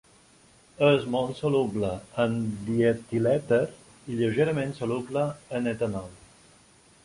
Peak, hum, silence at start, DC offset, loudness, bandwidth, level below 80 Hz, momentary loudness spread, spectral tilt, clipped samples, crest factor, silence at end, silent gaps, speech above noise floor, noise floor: -8 dBFS; none; 0.8 s; under 0.1%; -27 LUFS; 11.5 kHz; -58 dBFS; 8 LU; -7 dB/octave; under 0.1%; 20 dB; 0.9 s; none; 32 dB; -57 dBFS